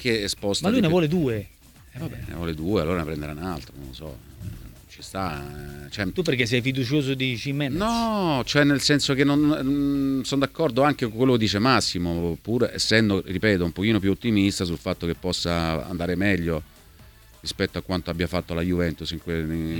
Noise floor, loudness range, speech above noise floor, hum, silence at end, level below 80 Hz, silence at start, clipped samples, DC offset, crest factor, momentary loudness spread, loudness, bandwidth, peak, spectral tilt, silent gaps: -49 dBFS; 9 LU; 26 dB; none; 0 s; -44 dBFS; 0 s; under 0.1%; under 0.1%; 22 dB; 15 LU; -24 LUFS; 19 kHz; -2 dBFS; -5 dB/octave; none